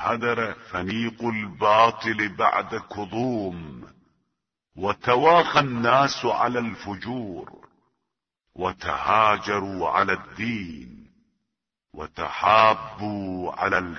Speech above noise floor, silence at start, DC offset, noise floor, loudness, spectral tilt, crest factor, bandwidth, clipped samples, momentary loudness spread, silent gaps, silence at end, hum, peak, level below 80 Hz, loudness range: 59 dB; 0 s; under 0.1%; -82 dBFS; -23 LUFS; -5 dB/octave; 22 dB; 6.6 kHz; under 0.1%; 15 LU; none; 0 s; none; -2 dBFS; -56 dBFS; 4 LU